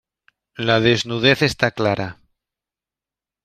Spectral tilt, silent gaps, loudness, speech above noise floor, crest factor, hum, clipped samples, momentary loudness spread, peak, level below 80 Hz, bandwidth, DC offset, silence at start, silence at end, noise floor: -5 dB/octave; none; -18 LUFS; 71 dB; 20 dB; none; under 0.1%; 10 LU; -2 dBFS; -52 dBFS; 15 kHz; under 0.1%; 0.6 s; 1.3 s; -89 dBFS